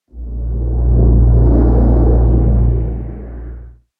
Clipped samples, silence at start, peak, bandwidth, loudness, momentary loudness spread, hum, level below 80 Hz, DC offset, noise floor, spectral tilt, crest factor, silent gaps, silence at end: under 0.1%; 0.15 s; 0 dBFS; 1.8 kHz; -13 LUFS; 18 LU; none; -14 dBFS; under 0.1%; -33 dBFS; -14 dB/octave; 12 dB; none; 0.3 s